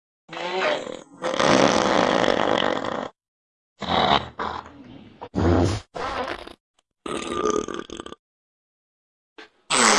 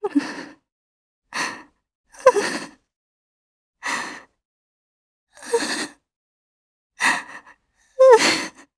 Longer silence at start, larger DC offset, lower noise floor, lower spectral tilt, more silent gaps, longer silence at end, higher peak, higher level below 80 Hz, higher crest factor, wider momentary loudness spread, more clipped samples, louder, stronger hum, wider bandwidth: first, 0.3 s vs 0 s; neither; second, -45 dBFS vs -55 dBFS; first, -3.5 dB/octave vs -2 dB/octave; second, 3.28-3.76 s, 6.60-6.74 s, 8.19-9.36 s vs 0.72-1.22 s, 1.95-2.04 s, 2.96-3.74 s, 4.45-5.27 s, 6.16-6.90 s; second, 0 s vs 0.3 s; about the same, 0 dBFS vs 0 dBFS; first, -48 dBFS vs -68 dBFS; about the same, 24 dB vs 24 dB; second, 19 LU vs 26 LU; neither; second, -23 LUFS vs -20 LUFS; neither; about the same, 12 kHz vs 11 kHz